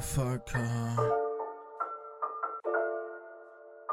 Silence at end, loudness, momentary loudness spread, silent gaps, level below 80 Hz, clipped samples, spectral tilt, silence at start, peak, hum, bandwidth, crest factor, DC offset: 0 s; -34 LUFS; 16 LU; none; -52 dBFS; under 0.1%; -6 dB/octave; 0 s; -16 dBFS; none; 16 kHz; 18 dB; under 0.1%